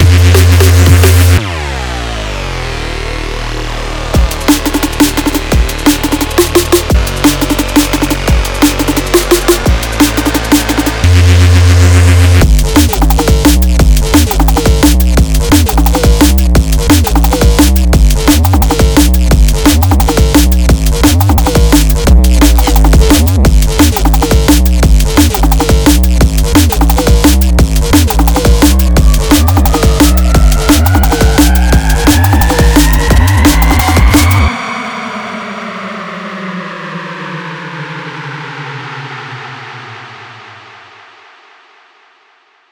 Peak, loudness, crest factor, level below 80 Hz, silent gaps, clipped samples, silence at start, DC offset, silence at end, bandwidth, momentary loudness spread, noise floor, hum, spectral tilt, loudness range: 0 dBFS; -9 LUFS; 8 dB; -10 dBFS; none; 1%; 0 s; under 0.1%; 2.2 s; over 20 kHz; 15 LU; -49 dBFS; none; -5 dB/octave; 13 LU